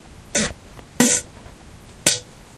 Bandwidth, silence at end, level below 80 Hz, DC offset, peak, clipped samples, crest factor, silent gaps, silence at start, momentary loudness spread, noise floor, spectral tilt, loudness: 15.5 kHz; 0.35 s; -46 dBFS; under 0.1%; 0 dBFS; under 0.1%; 24 dB; none; 0.35 s; 15 LU; -43 dBFS; -2 dB/octave; -20 LUFS